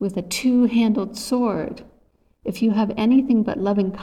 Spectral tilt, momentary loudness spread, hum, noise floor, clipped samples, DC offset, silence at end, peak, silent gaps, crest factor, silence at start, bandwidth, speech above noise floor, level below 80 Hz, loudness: -6 dB/octave; 13 LU; none; -60 dBFS; under 0.1%; under 0.1%; 0 s; -8 dBFS; none; 12 dB; 0 s; 15 kHz; 40 dB; -52 dBFS; -20 LUFS